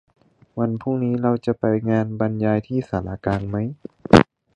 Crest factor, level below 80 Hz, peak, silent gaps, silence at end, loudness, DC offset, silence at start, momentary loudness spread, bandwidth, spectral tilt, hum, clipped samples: 22 dB; -44 dBFS; 0 dBFS; none; 0.3 s; -21 LUFS; under 0.1%; 0.55 s; 12 LU; 10.5 kHz; -7.5 dB/octave; none; under 0.1%